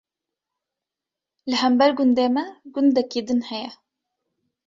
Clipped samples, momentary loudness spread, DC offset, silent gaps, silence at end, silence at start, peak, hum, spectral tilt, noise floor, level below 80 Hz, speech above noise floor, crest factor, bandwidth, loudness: under 0.1%; 14 LU; under 0.1%; none; 0.95 s; 1.45 s; -4 dBFS; none; -4.5 dB/octave; -87 dBFS; -68 dBFS; 67 dB; 18 dB; 7.6 kHz; -21 LUFS